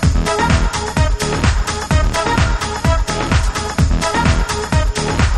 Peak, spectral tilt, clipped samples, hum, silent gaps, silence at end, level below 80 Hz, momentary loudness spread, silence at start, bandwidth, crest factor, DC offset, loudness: -2 dBFS; -5 dB/octave; under 0.1%; none; none; 0 s; -18 dBFS; 3 LU; 0 s; 13.5 kHz; 14 dB; under 0.1%; -16 LUFS